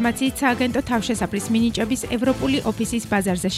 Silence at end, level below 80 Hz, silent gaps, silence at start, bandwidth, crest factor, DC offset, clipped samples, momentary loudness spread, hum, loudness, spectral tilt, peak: 0 s; -42 dBFS; none; 0 s; 15.5 kHz; 16 dB; under 0.1%; under 0.1%; 3 LU; none; -22 LUFS; -4.5 dB/octave; -6 dBFS